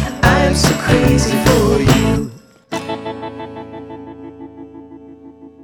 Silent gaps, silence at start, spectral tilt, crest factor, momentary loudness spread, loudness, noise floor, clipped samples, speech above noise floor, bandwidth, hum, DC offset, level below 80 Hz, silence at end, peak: none; 0 s; -5 dB/octave; 16 dB; 22 LU; -14 LUFS; -39 dBFS; under 0.1%; 26 dB; over 20 kHz; none; under 0.1%; -28 dBFS; 0 s; 0 dBFS